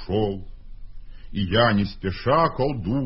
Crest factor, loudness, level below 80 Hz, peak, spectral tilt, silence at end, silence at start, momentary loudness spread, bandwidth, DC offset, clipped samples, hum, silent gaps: 18 dB; -23 LUFS; -40 dBFS; -4 dBFS; -11 dB/octave; 0 s; 0 s; 10 LU; 5.8 kHz; under 0.1%; under 0.1%; none; none